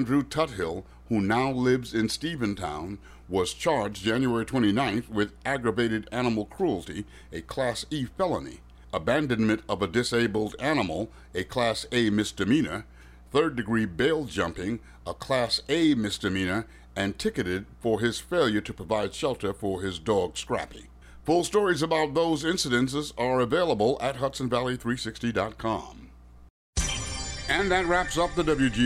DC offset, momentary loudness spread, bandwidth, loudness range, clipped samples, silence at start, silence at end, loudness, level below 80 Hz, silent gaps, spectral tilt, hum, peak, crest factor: under 0.1%; 9 LU; 15.5 kHz; 3 LU; under 0.1%; 0 s; 0 s; -27 LUFS; -46 dBFS; 26.50-26.73 s; -5 dB/octave; none; -12 dBFS; 16 dB